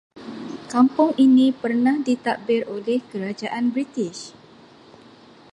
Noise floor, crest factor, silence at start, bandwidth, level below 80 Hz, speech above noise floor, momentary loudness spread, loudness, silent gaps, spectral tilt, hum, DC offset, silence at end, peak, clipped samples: -48 dBFS; 18 dB; 0.15 s; 10.5 kHz; -70 dBFS; 28 dB; 19 LU; -21 LUFS; none; -5.5 dB/octave; none; under 0.1%; 1.25 s; -4 dBFS; under 0.1%